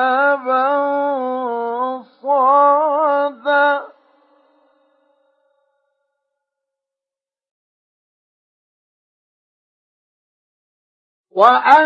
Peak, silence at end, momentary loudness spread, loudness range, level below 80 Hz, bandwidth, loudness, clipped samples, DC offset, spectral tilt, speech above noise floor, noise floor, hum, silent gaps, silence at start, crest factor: 0 dBFS; 0 s; 11 LU; 7 LU; -74 dBFS; 7.2 kHz; -16 LUFS; under 0.1%; under 0.1%; -4.5 dB/octave; over 78 dB; under -90 dBFS; none; 7.51-11.24 s; 0 s; 18 dB